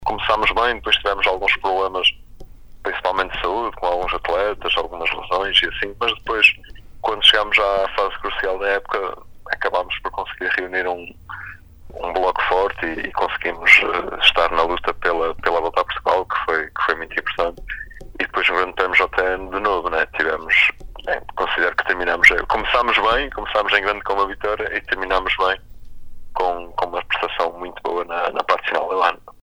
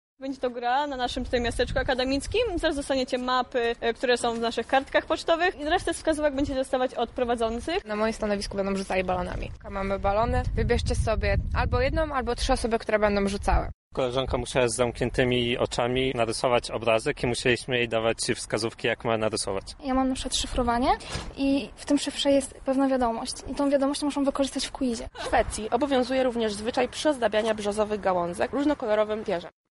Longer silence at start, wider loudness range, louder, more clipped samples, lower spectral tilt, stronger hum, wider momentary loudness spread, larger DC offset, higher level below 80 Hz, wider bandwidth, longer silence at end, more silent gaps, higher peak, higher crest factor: second, 0 s vs 0.2 s; first, 6 LU vs 2 LU; first, -19 LUFS vs -26 LUFS; neither; second, -3 dB/octave vs -4.5 dB/octave; neither; first, 12 LU vs 5 LU; neither; about the same, -40 dBFS vs -38 dBFS; first, over 20 kHz vs 11.5 kHz; about the same, 0.1 s vs 0.2 s; second, none vs 13.74-13.91 s; first, 0 dBFS vs -8 dBFS; about the same, 20 dB vs 18 dB